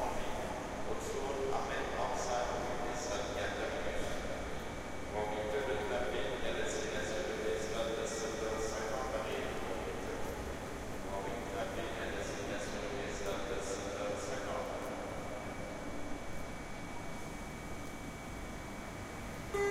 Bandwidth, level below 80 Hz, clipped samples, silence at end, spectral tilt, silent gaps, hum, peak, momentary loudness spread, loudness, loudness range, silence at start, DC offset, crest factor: 16 kHz; -50 dBFS; under 0.1%; 0 s; -4 dB/octave; none; none; -22 dBFS; 8 LU; -39 LUFS; 7 LU; 0 s; under 0.1%; 16 dB